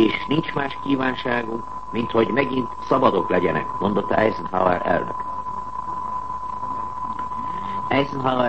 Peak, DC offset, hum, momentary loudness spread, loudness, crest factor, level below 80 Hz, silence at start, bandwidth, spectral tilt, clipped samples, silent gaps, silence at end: -2 dBFS; 1%; none; 9 LU; -23 LUFS; 20 dB; -48 dBFS; 0 s; 8.6 kHz; -7 dB/octave; under 0.1%; none; 0 s